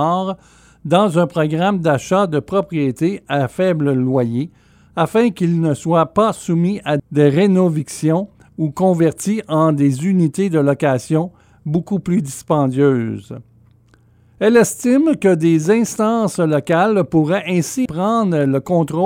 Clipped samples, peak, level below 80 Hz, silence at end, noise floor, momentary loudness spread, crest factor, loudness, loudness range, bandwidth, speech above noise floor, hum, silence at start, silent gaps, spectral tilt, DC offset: under 0.1%; 0 dBFS; -54 dBFS; 0 s; -52 dBFS; 7 LU; 16 dB; -16 LUFS; 3 LU; 16 kHz; 36 dB; none; 0 s; none; -6.5 dB/octave; under 0.1%